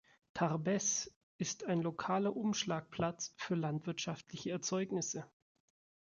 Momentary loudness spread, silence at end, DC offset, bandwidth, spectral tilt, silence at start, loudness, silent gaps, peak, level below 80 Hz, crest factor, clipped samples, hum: 9 LU; 0.9 s; under 0.1%; 7.4 kHz; -4 dB/octave; 0.35 s; -38 LUFS; 1.16-1.39 s; -20 dBFS; -74 dBFS; 18 dB; under 0.1%; none